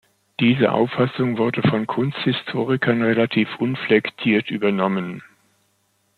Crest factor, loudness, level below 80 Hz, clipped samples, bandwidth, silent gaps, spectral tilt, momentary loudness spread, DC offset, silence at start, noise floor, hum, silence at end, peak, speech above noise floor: 18 dB; -20 LUFS; -62 dBFS; under 0.1%; 4.7 kHz; none; -8 dB/octave; 5 LU; under 0.1%; 0.4 s; -66 dBFS; none; 0.95 s; -4 dBFS; 46 dB